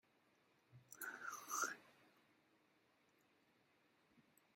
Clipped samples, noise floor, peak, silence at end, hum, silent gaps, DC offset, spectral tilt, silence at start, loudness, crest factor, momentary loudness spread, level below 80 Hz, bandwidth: under 0.1%; -78 dBFS; -28 dBFS; 0.35 s; none; none; under 0.1%; -0.5 dB/octave; 0.7 s; -47 LUFS; 28 dB; 14 LU; under -90 dBFS; 16.5 kHz